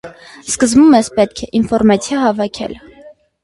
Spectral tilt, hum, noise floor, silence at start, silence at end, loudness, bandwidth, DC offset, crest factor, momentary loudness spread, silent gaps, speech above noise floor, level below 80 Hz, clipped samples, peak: -4.5 dB/octave; none; -42 dBFS; 0.05 s; 0.3 s; -13 LUFS; 11.5 kHz; under 0.1%; 14 dB; 17 LU; none; 28 dB; -44 dBFS; under 0.1%; 0 dBFS